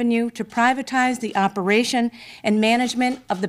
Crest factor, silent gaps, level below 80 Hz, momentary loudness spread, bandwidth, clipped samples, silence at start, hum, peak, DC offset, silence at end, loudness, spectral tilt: 14 dB; none; -64 dBFS; 5 LU; 15 kHz; under 0.1%; 0 s; none; -6 dBFS; under 0.1%; 0 s; -21 LUFS; -4.5 dB/octave